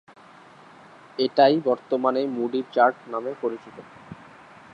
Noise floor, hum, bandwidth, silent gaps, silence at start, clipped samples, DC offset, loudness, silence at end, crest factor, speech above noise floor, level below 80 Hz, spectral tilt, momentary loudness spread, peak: -49 dBFS; none; 7.8 kHz; none; 1.2 s; under 0.1%; under 0.1%; -23 LUFS; 0.6 s; 20 dB; 26 dB; -72 dBFS; -7 dB/octave; 25 LU; -4 dBFS